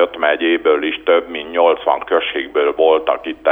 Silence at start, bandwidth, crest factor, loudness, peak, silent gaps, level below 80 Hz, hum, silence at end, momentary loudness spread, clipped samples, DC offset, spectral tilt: 0 s; 3.8 kHz; 16 dB; -16 LUFS; 0 dBFS; none; -54 dBFS; 50 Hz at -55 dBFS; 0 s; 4 LU; under 0.1%; under 0.1%; -5.5 dB/octave